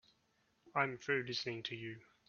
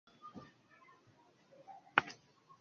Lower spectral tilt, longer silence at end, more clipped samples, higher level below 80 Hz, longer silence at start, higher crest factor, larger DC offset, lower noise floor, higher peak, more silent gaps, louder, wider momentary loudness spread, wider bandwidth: first, -2.5 dB/octave vs -0.5 dB/octave; second, 0.3 s vs 0.45 s; neither; about the same, -80 dBFS vs -82 dBFS; first, 0.65 s vs 0.25 s; second, 22 dB vs 38 dB; neither; first, -77 dBFS vs -68 dBFS; second, -20 dBFS vs -6 dBFS; neither; second, -39 LUFS vs -36 LUFS; second, 9 LU vs 25 LU; about the same, 7 kHz vs 7.2 kHz